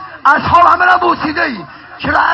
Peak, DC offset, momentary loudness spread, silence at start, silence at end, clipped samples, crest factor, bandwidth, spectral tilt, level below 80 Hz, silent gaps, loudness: 0 dBFS; under 0.1%; 11 LU; 0 s; 0 s; 0.5%; 12 dB; 8 kHz; -5.5 dB/octave; -38 dBFS; none; -11 LUFS